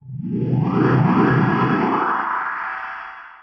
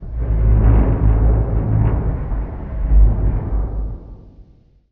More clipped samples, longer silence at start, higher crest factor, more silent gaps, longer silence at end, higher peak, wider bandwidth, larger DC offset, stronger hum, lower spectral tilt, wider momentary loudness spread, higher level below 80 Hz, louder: neither; about the same, 0.05 s vs 0 s; about the same, 14 dB vs 14 dB; neither; second, 0.05 s vs 0.5 s; second, -6 dBFS vs -2 dBFS; first, 6 kHz vs 2.8 kHz; neither; neither; second, -9.5 dB/octave vs -11.5 dB/octave; about the same, 13 LU vs 12 LU; second, -52 dBFS vs -18 dBFS; about the same, -19 LUFS vs -18 LUFS